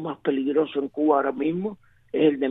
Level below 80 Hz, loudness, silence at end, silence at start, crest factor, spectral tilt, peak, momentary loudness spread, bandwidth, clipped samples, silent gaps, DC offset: -68 dBFS; -24 LUFS; 0 s; 0 s; 16 dB; -9.5 dB/octave; -8 dBFS; 9 LU; 3.9 kHz; under 0.1%; none; under 0.1%